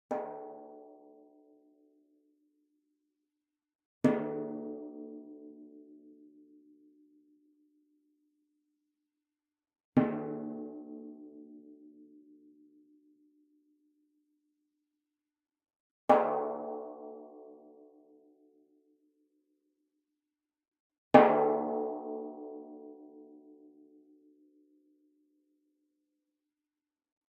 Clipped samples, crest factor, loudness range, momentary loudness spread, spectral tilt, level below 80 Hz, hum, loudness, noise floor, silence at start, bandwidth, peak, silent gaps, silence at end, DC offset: under 0.1%; 32 dB; 22 LU; 27 LU; -6 dB/octave; -82 dBFS; none; -31 LUFS; under -90 dBFS; 0.1 s; 4.3 kHz; -6 dBFS; 3.75-3.79 s, 3.85-4.01 s, 9.84-9.92 s, 15.76-16.08 s, 20.68-20.72 s, 20.80-20.90 s, 20.98-21.11 s; 4 s; under 0.1%